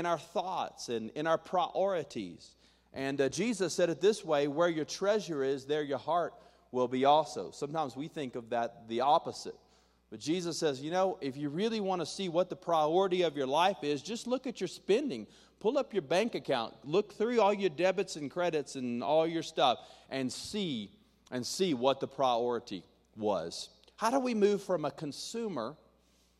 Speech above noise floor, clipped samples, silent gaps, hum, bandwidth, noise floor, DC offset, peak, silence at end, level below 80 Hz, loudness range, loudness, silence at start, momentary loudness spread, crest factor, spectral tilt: 36 dB; under 0.1%; none; none; 13.5 kHz; -68 dBFS; under 0.1%; -12 dBFS; 0.65 s; -72 dBFS; 3 LU; -33 LUFS; 0 s; 11 LU; 20 dB; -4.5 dB/octave